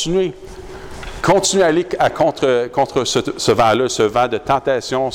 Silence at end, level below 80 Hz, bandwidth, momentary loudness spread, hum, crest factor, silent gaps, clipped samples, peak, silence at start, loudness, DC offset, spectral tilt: 0 s; -40 dBFS; 16.5 kHz; 18 LU; none; 12 dB; none; under 0.1%; -6 dBFS; 0 s; -16 LUFS; under 0.1%; -4 dB/octave